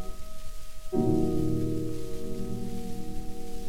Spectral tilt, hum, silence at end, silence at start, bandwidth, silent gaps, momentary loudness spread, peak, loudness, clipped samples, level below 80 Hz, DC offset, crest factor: -7.5 dB/octave; none; 0 s; 0 s; 16 kHz; none; 19 LU; -12 dBFS; -32 LUFS; under 0.1%; -38 dBFS; under 0.1%; 16 dB